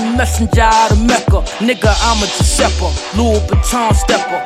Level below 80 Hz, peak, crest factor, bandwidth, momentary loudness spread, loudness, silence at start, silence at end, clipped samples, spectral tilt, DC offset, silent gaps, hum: -18 dBFS; 0 dBFS; 12 dB; 15 kHz; 5 LU; -13 LUFS; 0 s; 0 s; under 0.1%; -4.5 dB/octave; under 0.1%; none; none